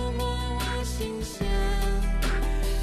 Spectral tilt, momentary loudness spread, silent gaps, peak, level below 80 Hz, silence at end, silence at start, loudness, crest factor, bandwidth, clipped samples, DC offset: -5 dB/octave; 4 LU; none; -16 dBFS; -28 dBFS; 0 s; 0 s; -29 LUFS; 10 dB; 14 kHz; under 0.1%; under 0.1%